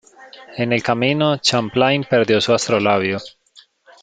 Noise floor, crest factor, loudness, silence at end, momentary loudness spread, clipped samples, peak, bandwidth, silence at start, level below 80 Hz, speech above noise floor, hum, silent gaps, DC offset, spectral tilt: -51 dBFS; 18 dB; -17 LUFS; 0.75 s; 8 LU; under 0.1%; -2 dBFS; 9.4 kHz; 0.2 s; -58 dBFS; 34 dB; none; none; under 0.1%; -4.5 dB/octave